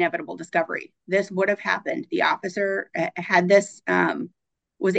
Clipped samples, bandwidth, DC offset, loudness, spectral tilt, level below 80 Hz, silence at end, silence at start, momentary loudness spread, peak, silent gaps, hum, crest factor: under 0.1%; 9 kHz; under 0.1%; -23 LUFS; -5 dB/octave; -76 dBFS; 0 s; 0 s; 10 LU; -4 dBFS; none; none; 20 dB